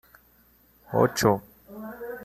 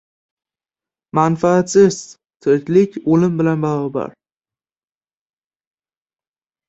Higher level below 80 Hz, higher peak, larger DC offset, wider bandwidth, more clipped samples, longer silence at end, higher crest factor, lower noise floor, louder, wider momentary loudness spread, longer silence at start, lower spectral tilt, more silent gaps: about the same, -56 dBFS vs -58 dBFS; second, -6 dBFS vs -2 dBFS; neither; first, 15 kHz vs 8.2 kHz; neither; second, 0 s vs 2.6 s; about the same, 22 dB vs 18 dB; second, -60 dBFS vs under -90 dBFS; second, -25 LUFS vs -16 LUFS; first, 20 LU vs 11 LU; second, 0.9 s vs 1.15 s; second, -5 dB/octave vs -6.5 dB/octave; neither